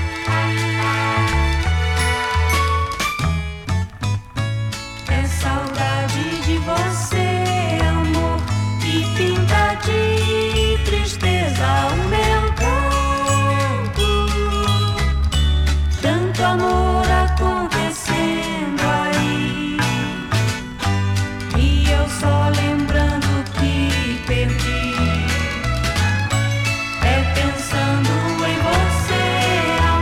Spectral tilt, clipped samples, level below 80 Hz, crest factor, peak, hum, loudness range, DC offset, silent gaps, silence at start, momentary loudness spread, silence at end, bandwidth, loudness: -5 dB/octave; under 0.1%; -24 dBFS; 10 dB; -8 dBFS; none; 3 LU; under 0.1%; none; 0 s; 4 LU; 0 s; 15.5 kHz; -19 LUFS